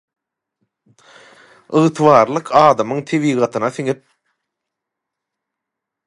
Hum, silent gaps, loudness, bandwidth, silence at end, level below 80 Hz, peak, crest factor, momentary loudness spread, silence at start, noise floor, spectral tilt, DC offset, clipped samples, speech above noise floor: none; none; -15 LUFS; 11.5 kHz; 2.15 s; -64 dBFS; 0 dBFS; 18 dB; 10 LU; 1.7 s; -82 dBFS; -6.5 dB/octave; under 0.1%; under 0.1%; 67 dB